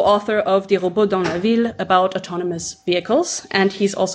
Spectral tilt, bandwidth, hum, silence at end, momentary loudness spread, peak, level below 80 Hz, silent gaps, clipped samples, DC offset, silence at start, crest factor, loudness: -4.5 dB/octave; 10 kHz; none; 0 s; 7 LU; -2 dBFS; -54 dBFS; none; under 0.1%; under 0.1%; 0 s; 16 dB; -19 LUFS